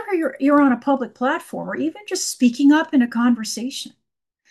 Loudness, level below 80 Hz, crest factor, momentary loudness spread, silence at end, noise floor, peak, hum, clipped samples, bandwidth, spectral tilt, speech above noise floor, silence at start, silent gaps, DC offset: -19 LUFS; -74 dBFS; 14 dB; 12 LU; 0.6 s; -74 dBFS; -6 dBFS; none; under 0.1%; 12.5 kHz; -3.5 dB/octave; 56 dB; 0 s; none; under 0.1%